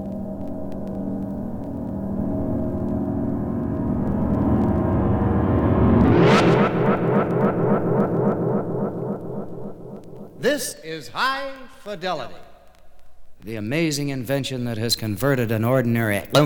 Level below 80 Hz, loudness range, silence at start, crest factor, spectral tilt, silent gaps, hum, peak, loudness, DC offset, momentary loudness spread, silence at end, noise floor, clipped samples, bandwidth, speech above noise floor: -38 dBFS; 9 LU; 0 s; 20 dB; -6.5 dB/octave; none; none; -2 dBFS; -22 LUFS; under 0.1%; 14 LU; 0 s; -42 dBFS; under 0.1%; 19 kHz; 20 dB